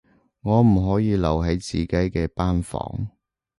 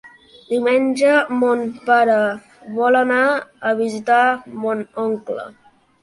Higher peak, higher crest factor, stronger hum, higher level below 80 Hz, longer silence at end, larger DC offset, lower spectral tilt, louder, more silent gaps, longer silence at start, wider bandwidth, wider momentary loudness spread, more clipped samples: second, -8 dBFS vs -2 dBFS; about the same, 16 dB vs 16 dB; neither; first, -34 dBFS vs -66 dBFS; about the same, 0.5 s vs 0.5 s; neither; first, -7.5 dB/octave vs -5 dB/octave; second, -22 LUFS vs -18 LUFS; neither; first, 0.45 s vs 0.05 s; about the same, 11.5 kHz vs 11.5 kHz; about the same, 13 LU vs 11 LU; neither